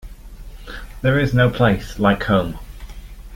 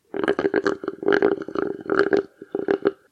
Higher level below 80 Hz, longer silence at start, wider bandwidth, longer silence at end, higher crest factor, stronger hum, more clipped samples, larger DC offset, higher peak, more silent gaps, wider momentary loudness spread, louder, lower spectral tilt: first, -34 dBFS vs -60 dBFS; about the same, 0.05 s vs 0.15 s; first, 16.5 kHz vs 8.2 kHz; second, 0 s vs 0.2 s; about the same, 18 dB vs 20 dB; neither; neither; neither; about the same, -2 dBFS vs -2 dBFS; neither; first, 23 LU vs 7 LU; first, -18 LUFS vs -23 LUFS; about the same, -7 dB/octave vs -6 dB/octave